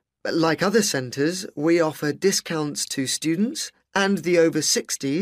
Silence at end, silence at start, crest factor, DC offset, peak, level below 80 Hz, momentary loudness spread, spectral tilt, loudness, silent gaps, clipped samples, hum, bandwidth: 0 s; 0.25 s; 16 dB; under 0.1%; -6 dBFS; -66 dBFS; 6 LU; -3.5 dB/octave; -22 LUFS; none; under 0.1%; none; 15.5 kHz